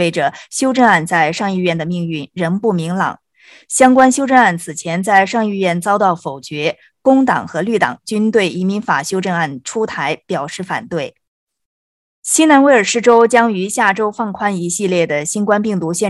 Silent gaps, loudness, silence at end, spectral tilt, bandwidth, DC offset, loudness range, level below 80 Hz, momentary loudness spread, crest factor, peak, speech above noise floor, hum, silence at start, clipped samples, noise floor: 11.28-11.47 s, 11.65-12.23 s; -15 LUFS; 0 s; -4.5 dB/octave; 13 kHz; under 0.1%; 5 LU; -58 dBFS; 11 LU; 14 dB; 0 dBFS; over 76 dB; none; 0 s; under 0.1%; under -90 dBFS